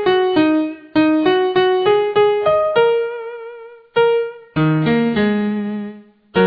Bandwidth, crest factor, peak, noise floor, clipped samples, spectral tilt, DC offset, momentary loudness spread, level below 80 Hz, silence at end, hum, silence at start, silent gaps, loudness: 5.2 kHz; 14 dB; -2 dBFS; -36 dBFS; under 0.1%; -9.5 dB/octave; under 0.1%; 11 LU; -52 dBFS; 0 s; none; 0 s; none; -16 LUFS